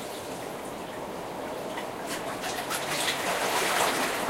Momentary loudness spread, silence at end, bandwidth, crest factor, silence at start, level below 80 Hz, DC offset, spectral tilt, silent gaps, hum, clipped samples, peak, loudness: 12 LU; 0 s; 16 kHz; 20 dB; 0 s; -60 dBFS; under 0.1%; -2 dB/octave; none; none; under 0.1%; -12 dBFS; -30 LUFS